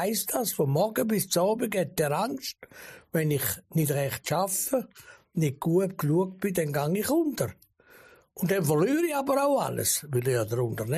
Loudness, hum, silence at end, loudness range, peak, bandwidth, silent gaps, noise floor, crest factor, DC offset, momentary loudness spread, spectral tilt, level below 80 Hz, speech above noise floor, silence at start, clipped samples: -27 LUFS; none; 0 s; 2 LU; -12 dBFS; 15 kHz; none; -56 dBFS; 14 dB; under 0.1%; 8 LU; -5 dB/octave; -62 dBFS; 29 dB; 0 s; under 0.1%